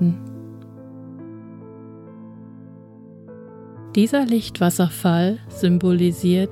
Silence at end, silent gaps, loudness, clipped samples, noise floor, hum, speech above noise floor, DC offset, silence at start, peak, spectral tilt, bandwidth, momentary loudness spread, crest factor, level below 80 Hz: 0 s; none; -20 LUFS; under 0.1%; -43 dBFS; none; 24 dB; under 0.1%; 0 s; -6 dBFS; -6.5 dB/octave; 16 kHz; 23 LU; 16 dB; -58 dBFS